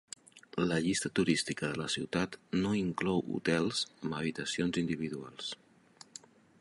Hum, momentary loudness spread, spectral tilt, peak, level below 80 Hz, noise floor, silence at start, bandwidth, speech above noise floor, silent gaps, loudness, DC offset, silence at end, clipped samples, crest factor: none; 18 LU; -4.5 dB/octave; -16 dBFS; -62 dBFS; -59 dBFS; 0.35 s; 11.5 kHz; 26 dB; none; -33 LUFS; under 0.1%; 1.05 s; under 0.1%; 18 dB